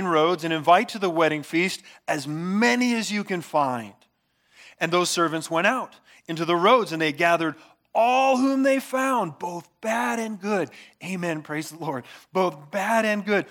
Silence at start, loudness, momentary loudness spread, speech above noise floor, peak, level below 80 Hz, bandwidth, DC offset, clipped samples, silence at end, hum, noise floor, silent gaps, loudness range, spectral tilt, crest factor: 0 s; -23 LUFS; 13 LU; 44 dB; -6 dBFS; -80 dBFS; 18.5 kHz; under 0.1%; under 0.1%; 0 s; none; -67 dBFS; none; 6 LU; -4.5 dB/octave; 18 dB